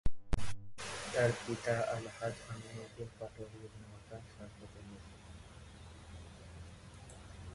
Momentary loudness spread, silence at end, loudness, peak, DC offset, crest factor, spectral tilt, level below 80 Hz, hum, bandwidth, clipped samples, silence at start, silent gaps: 19 LU; 0 s; -40 LUFS; -18 dBFS; under 0.1%; 20 dB; -5 dB/octave; -50 dBFS; none; 11.5 kHz; under 0.1%; 0.05 s; none